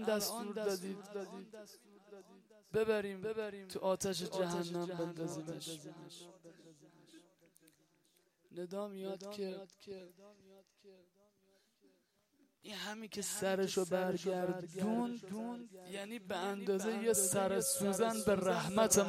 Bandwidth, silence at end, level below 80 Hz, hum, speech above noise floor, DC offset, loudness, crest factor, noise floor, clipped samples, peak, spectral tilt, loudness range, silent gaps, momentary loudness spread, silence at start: 16 kHz; 0 s; -74 dBFS; none; 37 dB; under 0.1%; -38 LUFS; 24 dB; -76 dBFS; under 0.1%; -16 dBFS; -4 dB/octave; 15 LU; none; 19 LU; 0 s